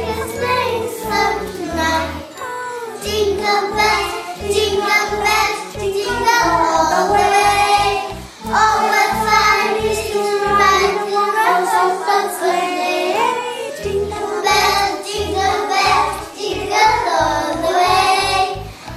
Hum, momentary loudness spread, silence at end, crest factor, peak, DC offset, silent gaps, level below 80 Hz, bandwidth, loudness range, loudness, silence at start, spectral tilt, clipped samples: none; 10 LU; 0 s; 16 dB; -2 dBFS; under 0.1%; none; -40 dBFS; 15.5 kHz; 4 LU; -16 LUFS; 0 s; -3 dB/octave; under 0.1%